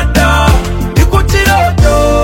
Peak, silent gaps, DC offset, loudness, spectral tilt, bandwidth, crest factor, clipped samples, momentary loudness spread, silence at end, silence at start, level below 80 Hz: 0 dBFS; none; under 0.1%; -9 LUFS; -5.5 dB/octave; 17 kHz; 8 dB; 0.6%; 4 LU; 0 s; 0 s; -12 dBFS